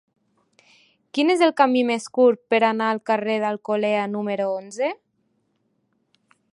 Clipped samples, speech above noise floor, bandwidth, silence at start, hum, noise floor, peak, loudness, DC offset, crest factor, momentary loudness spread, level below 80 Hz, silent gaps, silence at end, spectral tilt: under 0.1%; 49 dB; 11.5 kHz; 1.15 s; none; -70 dBFS; -2 dBFS; -21 LUFS; under 0.1%; 20 dB; 9 LU; -80 dBFS; none; 1.6 s; -5 dB/octave